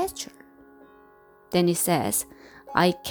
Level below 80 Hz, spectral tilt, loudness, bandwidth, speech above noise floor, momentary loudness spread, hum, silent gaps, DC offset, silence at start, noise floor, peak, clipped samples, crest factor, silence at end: -58 dBFS; -4 dB/octave; -24 LUFS; over 20 kHz; 31 dB; 15 LU; none; none; under 0.1%; 0 s; -54 dBFS; -4 dBFS; under 0.1%; 22 dB; 0 s